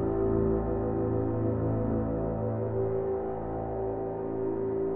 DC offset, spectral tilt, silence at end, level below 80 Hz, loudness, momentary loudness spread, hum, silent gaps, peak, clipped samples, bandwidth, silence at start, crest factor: under 0.1%; -14 dB/octave; 0 s; -44 dBFS; -30 LUFS; 5 LU; none; none; -16 dBFS; under 0.1%; 2.9 kHz; 0 s; 14 dB